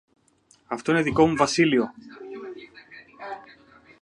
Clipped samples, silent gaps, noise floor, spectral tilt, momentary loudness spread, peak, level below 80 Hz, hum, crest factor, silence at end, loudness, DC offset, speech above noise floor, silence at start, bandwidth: under 0.1%; none; -61 dBFS; -5 dB/octave; 23 LU; -4 dBFS; -56 dBFS; none; 22 dB; 0.6 s; -22 LUFS; under 0.1%; 39 dB; 0.7 s; 11 kHz